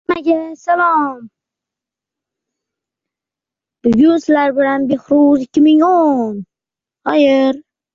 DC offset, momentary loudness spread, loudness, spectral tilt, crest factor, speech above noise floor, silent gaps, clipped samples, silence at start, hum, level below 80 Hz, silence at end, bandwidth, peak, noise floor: under 0.1%; 11 LU; -13 LUFS; -6.5 dB/octave; 12 dB; 75 dB; none; under 0.1%; 0.1 s; none; -56 dBFS; 0.35 s; 7.4 kHz; -2 dBFS; -87 dBFS